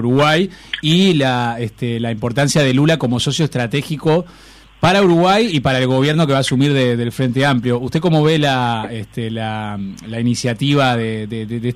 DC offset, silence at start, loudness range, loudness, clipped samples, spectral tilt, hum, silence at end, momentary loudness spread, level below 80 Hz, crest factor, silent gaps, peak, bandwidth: under 0.1%; 0 s; 3 LU; -16 LUFS; under 0.1%; -5.5 dB/octave; none; 0 s; 10 LU; -46 dBFS; 12 dB; none; -4 dBFS; 14.5 kHz